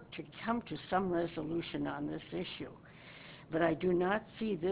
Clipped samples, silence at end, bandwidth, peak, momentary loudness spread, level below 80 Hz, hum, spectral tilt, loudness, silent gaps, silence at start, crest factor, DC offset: under 0.1%; 0 s; 4 kHz; -16 dBFS; 18 LU; -62 dBFS; none; -5 dB/octave; -36 LUFS; none; 0 s; 20 dB; under 0.1%